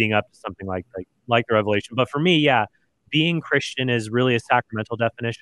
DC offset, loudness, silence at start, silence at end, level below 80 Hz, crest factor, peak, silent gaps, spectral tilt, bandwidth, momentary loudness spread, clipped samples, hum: under 0.1%; -21 LUFS; 0 s; 0.05 s; -62 dBFS; 20 dB; -2 dBFS; none; -5.5 dB/octave; 11.5 kHz; 13 LU; under 0.1%; none